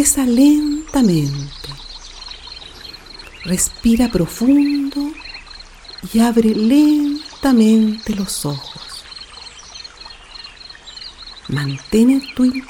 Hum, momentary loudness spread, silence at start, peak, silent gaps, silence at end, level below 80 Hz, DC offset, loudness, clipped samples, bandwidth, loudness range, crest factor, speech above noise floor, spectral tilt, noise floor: none; 21 LU; 0 s; 0 dBFS; none; 0.05 s; -40 dBFS; under 0.1%; -16 LUFS; under 0.1%; 17.5 kHz; 11 LU; 16 dB; 23 dB; -4.5 dB/octave; -38 dBFS